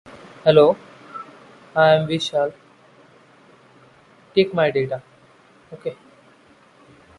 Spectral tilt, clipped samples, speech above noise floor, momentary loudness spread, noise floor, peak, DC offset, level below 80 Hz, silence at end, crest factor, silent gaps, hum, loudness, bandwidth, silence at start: -6 dB/octave; under 0.1%; 35 dB; 22 LU; -52 dBFS; -2 dBFS; under 0.1%; -62 dBFS; 1.25 s; 22 dB; none; none; -19 LUFS; 11 kHz; 0.45 s